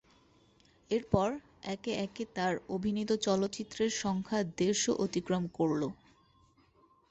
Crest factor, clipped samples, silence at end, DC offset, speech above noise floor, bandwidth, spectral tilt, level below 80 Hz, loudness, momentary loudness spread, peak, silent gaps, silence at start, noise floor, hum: 22 dB; under 0.1%; 1.15 s; under 0.1%; 34 dB; 8.4 kHz; -4.5 dB/octave; -60 dBFS; -33 LUFS; 7 LU; -12 dBFS; none; 0.9 s; -66 dBFS; none